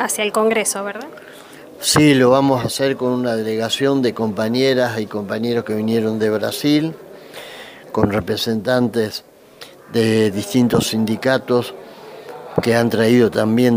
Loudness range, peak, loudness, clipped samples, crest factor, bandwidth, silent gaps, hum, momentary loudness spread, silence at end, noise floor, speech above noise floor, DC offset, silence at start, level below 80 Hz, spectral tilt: 4 LU; -2 dBFS; -17 LUFS; under 0.1%; 16 dB; 16 kHz; none; none; 20 LU; 0 s; -41 dBFS; 25 dB; under 0.1%; 0 s; -52 dBFS; -5 dB/octave